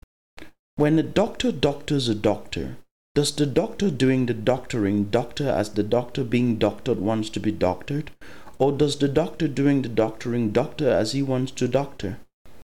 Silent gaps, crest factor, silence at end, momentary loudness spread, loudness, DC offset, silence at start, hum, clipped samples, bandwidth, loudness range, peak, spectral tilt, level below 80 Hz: 0.59-0.77 s, 2.91-3.15 s; 18 dB; 0.3 s; 8 LU; -24 LUFS; 1%; 0.4 s; none; under 0.1%; 16 kHz; 2 LU; -6 dBFS; -6 dB/octave; -48 dBFS